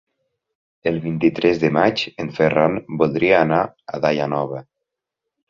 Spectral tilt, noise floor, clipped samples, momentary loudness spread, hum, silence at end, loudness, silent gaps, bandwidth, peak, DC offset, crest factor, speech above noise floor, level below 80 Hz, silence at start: -7 dB/octave; -82 dBFS; under 0.1%; 10 LU; none; 0.9 s; -19 LUFS; none; 7.2 kHz; -2 dBFS; under 0.1%; 18 dB; 64 dB; -54 dBFS; 0.85 s